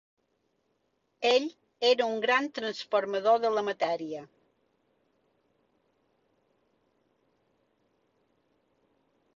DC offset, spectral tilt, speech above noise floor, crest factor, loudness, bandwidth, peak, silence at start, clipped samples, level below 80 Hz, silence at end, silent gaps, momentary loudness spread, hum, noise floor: under 0.1%; -3 dB/octave; 48 dB; 20 dB; -28 LUFS; 7.6 kHz; -12 dBFS; 1.2 s; under 0.1%; -80 dBFS; 5.1 s; none; 10 LU; none; -76 dBFS